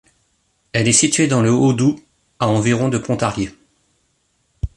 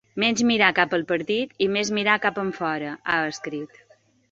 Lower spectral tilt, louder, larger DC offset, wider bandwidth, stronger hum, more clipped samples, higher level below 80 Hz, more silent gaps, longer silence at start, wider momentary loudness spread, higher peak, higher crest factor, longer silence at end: about the same, -4.5 dB/octave vs -3.5 dB/octave; first, -17 LUFS vs -23 LUFS; neither; first, 11.5 kHz vs 8 kHz; neither; neither; first, -40 dBFS vs -64 dBFS; neither; first, 0.75 s vs 0.15 s; about the same, 13 LU vs 12 LU; about the same, 0 dBFS vs -2 dBFS; about the same, 18 dB vs 22 dB; second, 0.1 s vs 0.65 s